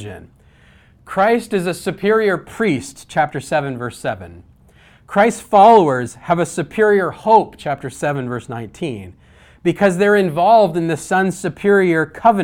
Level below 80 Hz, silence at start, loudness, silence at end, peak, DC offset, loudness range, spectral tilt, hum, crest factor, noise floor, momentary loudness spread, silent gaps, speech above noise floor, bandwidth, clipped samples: -52 dBFS; 0 s; -16 LUFS; 0 s; 0 dBFS; under 0.1%; 5 LU; -6 dB/octave; none; 16 dB; -49 dBFS; 13 LU; none; 33 dB; 16 kHz; under 0.1%